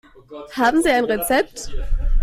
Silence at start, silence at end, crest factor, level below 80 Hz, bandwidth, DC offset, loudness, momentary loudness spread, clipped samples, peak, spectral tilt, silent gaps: 0.3 s; 0 s; 12 dB; -24 dBFS; 16 kHz; under 0.1%; -19 LUFS; 16 LU; under 0.1%; -6 dBFS; -4.5 dB/octave; none